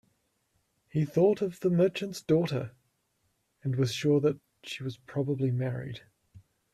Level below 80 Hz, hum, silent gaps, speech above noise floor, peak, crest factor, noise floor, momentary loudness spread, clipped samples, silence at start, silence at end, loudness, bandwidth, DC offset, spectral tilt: -66 dBFS; none; none; 47 dB; -12 dBFS; 18 dB; -75 dBFS; 14 LU; under 0.1%; 0.95 s; 0.35 s; -29 LUFS; 13.5 kHz; under 0.1%; -7 dB/octave